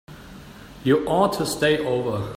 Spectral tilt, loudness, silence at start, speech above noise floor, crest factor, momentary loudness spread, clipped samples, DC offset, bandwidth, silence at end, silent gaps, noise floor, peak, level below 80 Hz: -5 dB/octave; -22 LUFS; 0.1 s; 21 dB; 18 dB; 22 LU; under 0.1%; under 0.1%; 16 kHz; 0 s; none; -42 dBFS; -6 dBFS; -50 dBFS